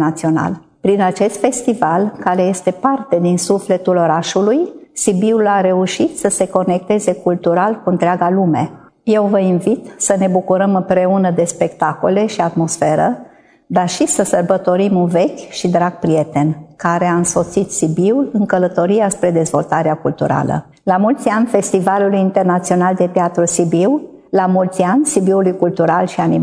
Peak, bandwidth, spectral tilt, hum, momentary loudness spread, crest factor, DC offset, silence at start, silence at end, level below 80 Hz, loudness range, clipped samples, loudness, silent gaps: 0 dBFS; 11 kHz; -5.5 dB/octave; none; 4 LU; 14 dB; under 0.1%; 0 s; 0 s; -54 dBFS; 1 LU; under 0.1%; -15 LUFS; none